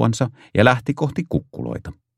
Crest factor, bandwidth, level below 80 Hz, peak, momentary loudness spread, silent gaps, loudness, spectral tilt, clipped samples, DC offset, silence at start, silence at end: 20 dB; 12 kHz; -46 dBFS; 0 dBFS; 14 LU; none; -21 LUFS; -6.5 dB/octave; under 0.1%; under 0.1%; 0 s; 0.25 s